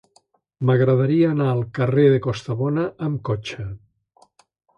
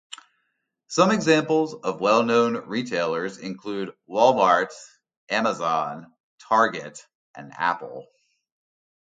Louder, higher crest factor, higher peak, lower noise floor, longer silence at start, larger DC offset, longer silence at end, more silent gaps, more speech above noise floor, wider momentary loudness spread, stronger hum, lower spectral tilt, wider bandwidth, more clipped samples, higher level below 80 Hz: first, -20 LUFS vs -23 LUFS; about the same, 18 dB vs 20 dB; about the same, -4 dBFS vs -4 dBFS; second, -62 dBFS vs -76 dBFS; first, 0.6 s vs 0.1 s; neither; about the same, 1 s vs 1.05 s; second, none vs 5.17-5.27 s, 6.20-6.38 s, 7.15-7.34 s; second, 42 dB vs 53 dB; second, 13 LU vs 21 LU; neither; first, -8.5 dB/octave vs -4.5 dB/octave; second, 8 kHz vs 9.4 kHz; neither; first, -52 dBFS vs -72 dBFS